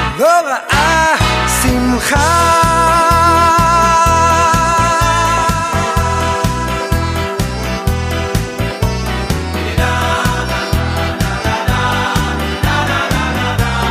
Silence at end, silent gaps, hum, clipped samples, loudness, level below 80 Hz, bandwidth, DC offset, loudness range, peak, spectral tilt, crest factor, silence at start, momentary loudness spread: 0 s; none; none; under 0.1%; -13 LUFS; -22 dBFS; 15.5 kHz; under 0.1%; 7 LU; 0 dBFS; -4.5 dB/octave; 12 dB; 0 s; 8 LU